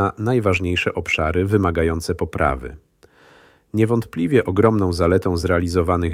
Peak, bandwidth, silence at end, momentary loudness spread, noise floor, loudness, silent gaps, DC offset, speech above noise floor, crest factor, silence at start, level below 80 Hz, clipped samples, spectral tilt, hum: -2 dBFS; 15.5 kHz; 0 s; 4 LU; -52 dBFS; -19 LUFS; none; under 0.1%; 33 dB; 18 dB; 0 s; -36 dBFS; under 0.1%; -6.5 dB/octave; none